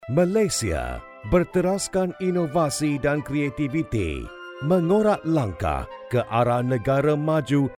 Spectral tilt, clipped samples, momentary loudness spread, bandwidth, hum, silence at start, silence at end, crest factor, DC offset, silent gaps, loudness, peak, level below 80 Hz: -6 dB/octave; under 0.1%; 8 LU; 16 kHz; none; 0 s; 0 s; 16 dB; under 0.1%; none; -23 LUFS; -6 dBFS; -42 dBFS